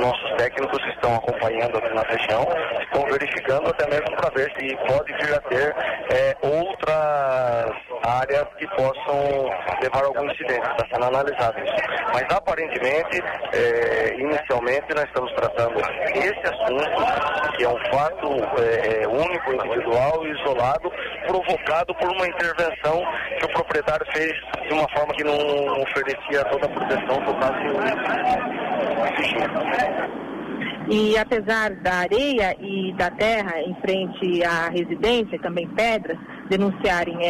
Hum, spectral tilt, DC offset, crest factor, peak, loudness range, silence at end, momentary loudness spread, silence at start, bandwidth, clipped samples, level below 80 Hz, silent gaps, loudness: none; -5 dB/octave; under 0.1%; 12 dB; -10 dBFS; 1 LU; 0 s; 4 LU; 0 s; 14.5 kHz; under 0.1%; -50 dBFS; none; -22 LUFS